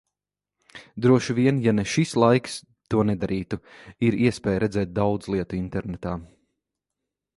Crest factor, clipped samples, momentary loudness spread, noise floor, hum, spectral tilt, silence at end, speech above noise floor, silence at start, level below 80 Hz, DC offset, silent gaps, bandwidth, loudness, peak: 20 dB; under 0.1%; 14 LU; -88 dBFS; 50 Hz at -50 dBFS; -6.5 dB/octave; 1.15 s; 65 dB; 0.75 s; -48 dBFS; under 0.1%; none; 11.5 kHz; -24 LUFS; -4 dBFS